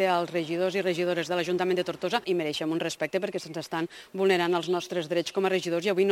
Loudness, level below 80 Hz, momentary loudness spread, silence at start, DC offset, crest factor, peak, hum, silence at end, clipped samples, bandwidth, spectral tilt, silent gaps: -28 LUFS; -72 dBFS; 7 LU; 0 s; under 0.1%; 18 dB; -10 dBFS; none; 0 s; under 0.1%; 16 kHz; -5 dB/octave; none